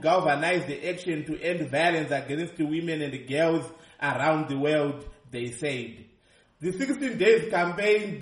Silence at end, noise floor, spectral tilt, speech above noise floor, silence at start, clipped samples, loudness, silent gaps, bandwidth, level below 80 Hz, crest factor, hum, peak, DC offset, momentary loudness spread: 0 s; -61 dBFS; -5.5 dB/octave; 35 dB; 0 s; under 0.1%; -27 LUFS; none; 11.5 kHz; -60 dBFS; 18 dB; none; -8 dBFS; under 0.1%; 11 LU